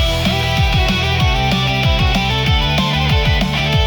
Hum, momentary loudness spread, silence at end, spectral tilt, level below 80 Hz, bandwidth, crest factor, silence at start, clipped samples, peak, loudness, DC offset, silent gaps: none; 1 LU; 0 s; -5 dB/octave; -22 dBFS; 19 kHz; 12 dB; 0 s; under 0.1%; -4 dBFS; -15 LUFS; under 0.1%; none